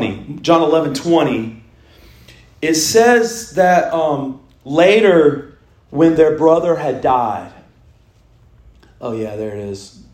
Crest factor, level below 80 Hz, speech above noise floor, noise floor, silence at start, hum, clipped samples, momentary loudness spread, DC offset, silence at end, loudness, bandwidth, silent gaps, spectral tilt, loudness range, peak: 16 dB; -50 dBFS; 36 dB; -50 dBFS; 0 s; none; under 0.1%; 17 LU; under 0.1%; 0.25 s; -14 LUFS; 16 kHz; none; -4.5 dB/octave; 6 LU; 0 dBFS